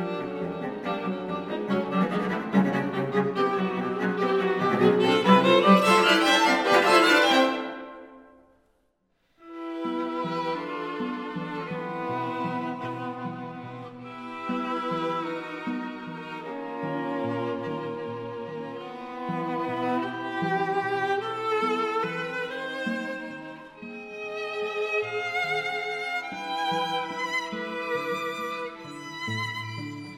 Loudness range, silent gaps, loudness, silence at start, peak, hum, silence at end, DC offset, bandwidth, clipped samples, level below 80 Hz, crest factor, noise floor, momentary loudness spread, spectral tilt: 12 LU; none; -26 LUFS; 0 s; -4 dBFS; none; 0 s; under 0.1%; 16 kHz; under 0.1%; -72 dBFS; 22 dB; -70 dBFS; 17 LU; -5 dB/octave